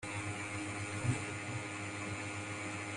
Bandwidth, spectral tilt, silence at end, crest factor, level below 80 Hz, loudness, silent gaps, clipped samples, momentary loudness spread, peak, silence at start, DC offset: 11.5 kHz; -4.5 dB/octave; 0 s; 18 dB; -66 dBFS; -40 LUFS; none; under 0.1%; 4 LU; -22 dBFS; 0 s; under 0.1%